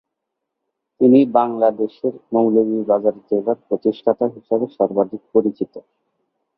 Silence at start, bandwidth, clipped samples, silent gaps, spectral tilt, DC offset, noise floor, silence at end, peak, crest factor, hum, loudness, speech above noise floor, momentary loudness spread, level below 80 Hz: 1 s; 5.2 kHz; under 0.1%; none; -11.5 dB/octave; under 0.1%; -79 dBFS; 0.75 s; 0 dBFS; 18 dB; none; -18 LUFS; 61 dB; 9 LU; -66 dBFS